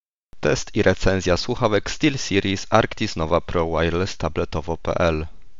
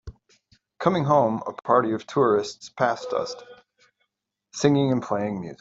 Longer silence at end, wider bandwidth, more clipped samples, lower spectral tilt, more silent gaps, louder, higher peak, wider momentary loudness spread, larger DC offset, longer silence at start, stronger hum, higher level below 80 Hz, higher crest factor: first, 0.25 s vs 0.05 s; about the same, 7.8 kHz vs 8 kHz; neither; second, -4.5 dB/octave vs -6 dB/octave; first, 0.00-0.28 s vs none; about the same, -22 LUFS vs -23 LUFS; first, 0 dBFS vs -4 dBFS; second, 6 LU vs 10 LU; first, 2% vs under 0.1%; about the same, 0 s vs 0.05 s; neither; first, -36 dBFS vs -56 dBFS; about the same, 22 dB vs 22 dB